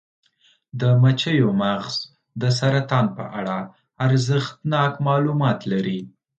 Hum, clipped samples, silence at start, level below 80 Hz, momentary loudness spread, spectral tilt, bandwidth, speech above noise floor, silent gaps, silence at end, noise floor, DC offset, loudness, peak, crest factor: none; under 0.1%; 0.75 s; -60 dBFS; 11 LU; -6.5 dB/octave; 8.8 kHz; 41 dB; none; 0.3 s; -61 dBFS; under 0.1%; -21 LUFS; -4 dBFS; 16 dB